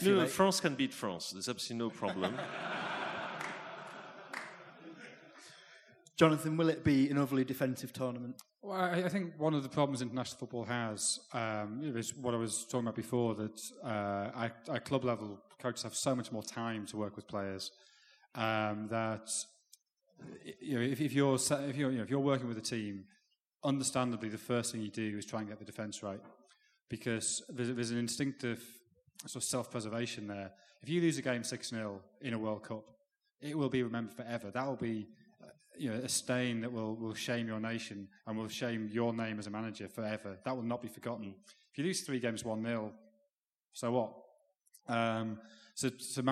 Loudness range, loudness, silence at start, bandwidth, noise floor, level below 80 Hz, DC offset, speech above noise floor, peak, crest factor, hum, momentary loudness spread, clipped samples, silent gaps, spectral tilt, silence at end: 6 LU; -37 LUFS; 0 s; 14 kHz; -84 dBFS; -76 dBFS; under 0.1%; 48 dB; -10 dBFS; 28 dB; none; 15 LU; under 0.1%; 19.92-19.97 s, 23.40-23.52 s, 26.82-26.87 s, 43.33-43.71 s; -4.5 dB/octave; 0 s